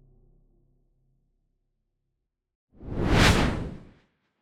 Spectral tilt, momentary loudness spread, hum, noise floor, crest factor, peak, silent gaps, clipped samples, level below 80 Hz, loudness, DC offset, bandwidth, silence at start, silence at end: -5 dB/octave; 18 LU; none; -81 dBFS; 22 dB; -6 dBFS; none; under 0.1%; -36 dBFS; -23 LUFS; under 0.1%; 17 kHz; 2.8 s; 0.6 s